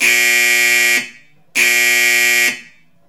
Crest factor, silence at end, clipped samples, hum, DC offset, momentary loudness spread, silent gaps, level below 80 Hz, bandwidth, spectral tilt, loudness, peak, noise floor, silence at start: 14 dB; 0.45 s; under 0.1%; none; under 0.1%; 9 LU; none; -72 dBFS; 19 kHz; 1.5 dB/octave; -11 LUFS; 0 dBFS; -43 dBFS; 0 s